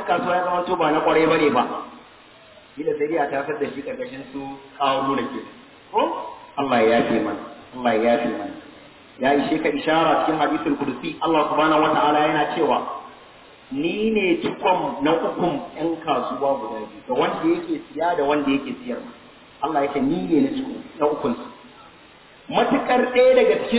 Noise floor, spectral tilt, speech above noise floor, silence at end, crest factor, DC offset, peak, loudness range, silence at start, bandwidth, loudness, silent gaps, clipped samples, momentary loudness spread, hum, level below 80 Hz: -48 dBFS; -9.5 dB/octave; 27 dB; 0 s; 18 dB; under 0.1%; -4 dBFS; 5 LU; 0 s; 4 kHz; -21 LUFS; none; under 0.1%; 15 LU; none; -58 dBFS